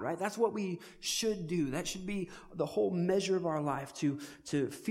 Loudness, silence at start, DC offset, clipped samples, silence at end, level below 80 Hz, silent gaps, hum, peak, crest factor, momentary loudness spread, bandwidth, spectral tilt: -34 LUFS; 0 s; under 0.1%; under 0.1%; 0 s; -62 dBFS; none; none; -16 dBFS; 18 dB; 8 LU; 16 kHz; -5 dB/octave